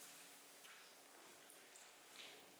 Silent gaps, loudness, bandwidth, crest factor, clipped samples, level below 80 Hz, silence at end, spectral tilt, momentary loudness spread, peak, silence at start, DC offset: none; -60 LUFS; over 20 kHz; 20 dB; under 0.1%; under -90 dBFS; 0 s; 0 dB/octave; 4 LU; -42 dBFS; 0 s; under 0.1%